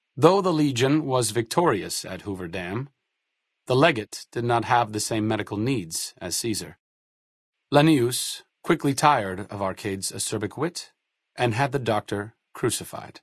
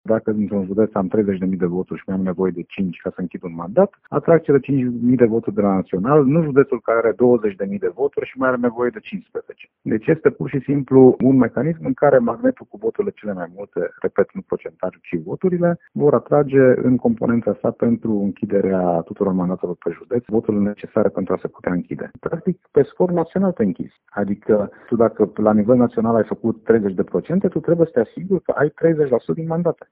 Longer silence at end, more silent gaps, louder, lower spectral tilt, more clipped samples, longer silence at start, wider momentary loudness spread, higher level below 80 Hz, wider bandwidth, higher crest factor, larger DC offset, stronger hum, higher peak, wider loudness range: second, 0.05 s vs 0.2 s; first, 6.80-7.52 s vs none; second, -24 LUFS vs -19 LUFS; second, -4.5 dB/octave vs -9 dB/octave; neither; about the same, 0.15 s vs 0.05 s; about the same, 12 LU vs 11 LU; second, -60 dBFS vs -54 dBFS; first, 12 kHz vs 3.8 kHz; first, 24 dB vs 18 dB; neither; neither; about the same, 0 dBFS vs 0 dBFS; about the same, 4 LU vs 5 LU